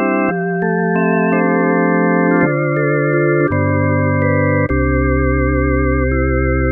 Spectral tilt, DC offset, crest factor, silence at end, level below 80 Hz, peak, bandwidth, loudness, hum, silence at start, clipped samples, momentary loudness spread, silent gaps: -13.5 dB/octave; under 0.1%; 14 dB; 0 s; -24 dBFS; -2 dBFS; 2.9 kHz; -15 LUFS; none; 0 s; under 0.1%; 2 LU; none